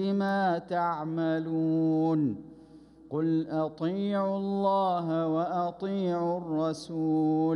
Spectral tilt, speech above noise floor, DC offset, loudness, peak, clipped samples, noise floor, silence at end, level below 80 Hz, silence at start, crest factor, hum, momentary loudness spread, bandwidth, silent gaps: -8 dB/octave; 24 dB; under 0.1%; -29 LUFS; -16 dBFS; under 0.1%; -52 dBFS; 0 s; -68 dBFS; 0 s; 12 dB; none; 6 LU; 10.5 kHz; none